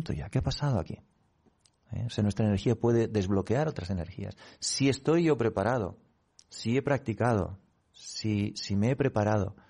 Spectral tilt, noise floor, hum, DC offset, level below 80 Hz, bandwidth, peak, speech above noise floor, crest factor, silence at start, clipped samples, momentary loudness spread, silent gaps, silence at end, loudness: -6 dB/octave; -67 dBFS; none; under 0.1%; -52 dBFS; 11 kHz; -14 dBFS; 38 dB; 16 dB; 0 s; under 0.1%; 14 LU; none; 0.15 s; -29 LUFS